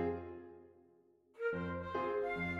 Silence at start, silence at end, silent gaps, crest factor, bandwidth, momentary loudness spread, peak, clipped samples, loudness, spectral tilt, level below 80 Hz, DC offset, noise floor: 0 s; 0 s; none; 16 dB; 11 kHz; 17 LU; -26 dBFS; under 0.1%; -40 LUFS; -8 dB/octave; -68 dBFS; under 0.1%; -69 dBFS